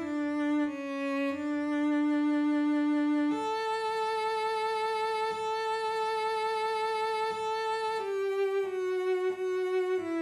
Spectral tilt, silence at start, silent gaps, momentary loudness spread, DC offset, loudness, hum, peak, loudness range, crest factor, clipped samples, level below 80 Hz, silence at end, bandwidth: -4 dB/octave; 0 s; none; 4 LU; under 0.1%; -30 LUFS; none; -22 dBFS; 2 LU; 8 dB; under 0.1%; -74 dBFS; 0 s; 12 kHz